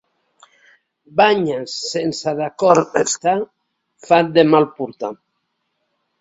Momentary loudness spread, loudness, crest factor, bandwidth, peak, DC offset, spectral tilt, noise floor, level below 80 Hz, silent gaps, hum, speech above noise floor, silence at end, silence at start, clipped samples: 13 LU; -17 LUFS; 18 dB; 8 kHz; 0 dBFS; under 0.1%; -4 dB/octave; -72 dBFS; -62 dBFS; none; none; 55 dB; 1.05 s; 1.15 s; under 0.1%